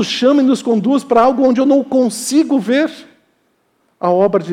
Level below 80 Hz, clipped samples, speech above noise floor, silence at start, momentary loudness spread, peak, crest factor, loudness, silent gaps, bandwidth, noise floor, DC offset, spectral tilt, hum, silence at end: -58 dBFS; under 0.1%; 48 dB; 0 s; 5 LU; -2 dBFS; 12 dB; -14 LUFS; none; 14 kHz; -61 dBFS; under 0.1%; -5 dB/octave; none; 0 s